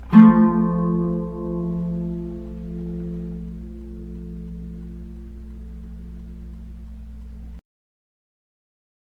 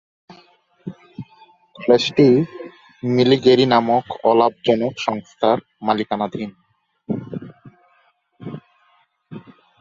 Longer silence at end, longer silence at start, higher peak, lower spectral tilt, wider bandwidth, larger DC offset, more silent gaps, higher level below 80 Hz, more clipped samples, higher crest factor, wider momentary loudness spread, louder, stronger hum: first, 1.45 s vs 0.4 s; second, 0 s vs 0.85 s; about the same, 0 dBFS vs -2 dBFS; first, -10.5 dB/octave vs -6.5 dB/octave; second, 3.7 kHz vs 7.6 kHz; neither; neither; first, -38 dBFS vs -60 dBFS; neither; about the same, 22 dB vs 18 dB; about the same, 22 LU vs 24 LU; about the same, -20 LUFS vs -18 LUFS; neither